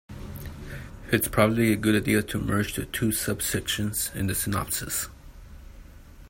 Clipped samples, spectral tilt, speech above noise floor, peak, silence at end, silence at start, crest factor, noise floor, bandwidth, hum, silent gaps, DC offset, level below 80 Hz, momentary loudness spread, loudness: under 0.1%; -4.5 dB/octave; 21 dB; -6 dBFS; 0 s; 0.1 s; 20 dB; -46 dBFS; 16.5 kHz; none; none; under 0.1%; -44 dBFS; 17 LU; -26 LUFS